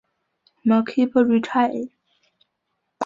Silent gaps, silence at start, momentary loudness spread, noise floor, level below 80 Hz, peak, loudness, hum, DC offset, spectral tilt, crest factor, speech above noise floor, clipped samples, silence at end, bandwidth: none; 0.65 s; 10 LU; -76 dBFS; -66 dBFS; -6 dBFS; -20 LUFS; none; under 0.1%; -7 dB/octave; 16 dB; 57 dB; under 0.1%; 0 s; 7.4 kHz